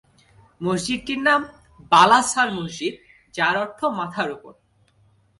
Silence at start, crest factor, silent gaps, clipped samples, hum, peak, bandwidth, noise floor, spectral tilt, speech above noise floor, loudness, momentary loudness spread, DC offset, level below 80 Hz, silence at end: 0.6 s; 20 dB; none; under 0.1%; none; -2 dBFS; 11.5 kHz; -60 dBFS; -3 dB/octave; 39 dB; -20 LUFS; 15 LU; under 0.1%; -58 dBFS; 0.9 s